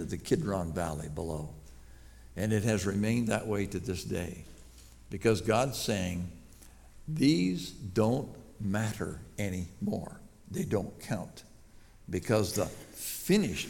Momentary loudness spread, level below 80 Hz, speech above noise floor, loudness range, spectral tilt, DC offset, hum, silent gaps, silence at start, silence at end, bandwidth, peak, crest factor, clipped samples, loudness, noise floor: 16 LU; -54 dBFS; 23 dB; 5 LU; -5.5 dB/octave; under 0.1%; none; none; 0 s; 0 s; 19 kHz; -14 dBFS; 20 dB; under 0.1%; -32 LUFS; -54 dBFS